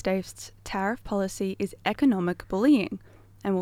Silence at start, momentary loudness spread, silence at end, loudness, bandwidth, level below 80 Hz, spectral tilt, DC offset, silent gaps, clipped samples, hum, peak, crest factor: 0.05 s; 13 LU; 0 s; -27 LUFS; 15.5 kHz; -52 dBFS; -6 dB/octave; under 0.1%; none; under 0.1%; none; -12 dBFS; 16 dB